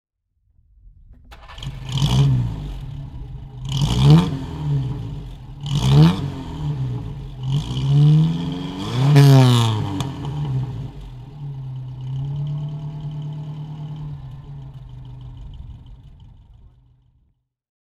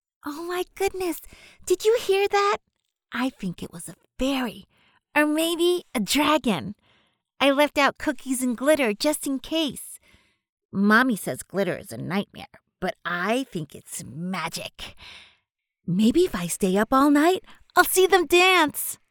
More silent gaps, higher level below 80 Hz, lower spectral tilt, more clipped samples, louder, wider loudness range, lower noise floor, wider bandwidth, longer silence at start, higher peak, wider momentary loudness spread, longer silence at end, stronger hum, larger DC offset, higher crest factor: second, none vs 10.49-10.57 s, 10.65-10.69 s; first, -36 dBFS vs -54 dBFS; first, -7 dB/octave vs -4 dB/octave; neither; first, -19 LUFS vs -23 LUFS; first, 17 LU vs 8 LU; second, -66 dBFS vs -75 dBFS; second, 13 kHz vs over 20 kHz; first, 0.85 s vs 0.25 s; first, 0 dBFS vs -4 dBFS; first, 23 LU vs 17 LU; first, 1.35 s vs 0.15 s; neither; neither; about the same, 20 dB vs 20 dB